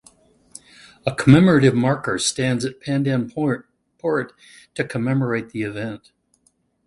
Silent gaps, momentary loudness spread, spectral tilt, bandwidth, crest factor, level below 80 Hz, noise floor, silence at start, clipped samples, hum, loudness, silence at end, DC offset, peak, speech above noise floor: none; 16 LU; -6 dB/octave; 11.5 kHz; 20 dB; -52 dBFS; -64 dBFS; 1.05 s; under 0.1%; none; -20 LUFS; 0.9 s; under 0.1%; 0 dBFS; 45 dB